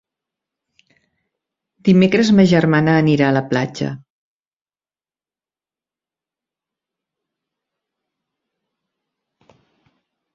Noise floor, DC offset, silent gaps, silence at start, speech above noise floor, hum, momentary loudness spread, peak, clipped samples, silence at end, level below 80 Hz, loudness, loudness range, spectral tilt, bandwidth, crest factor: under -90 dBFS; under 0.1%; none; 1.85 s; over 76 dB; none; 13 LU; -2 dBFS; under 0.1%; 6.4 s; -56 dBFS; -15 LUFS; 13 LU; -7 dB/octave; 7.6 kHz; 20 dB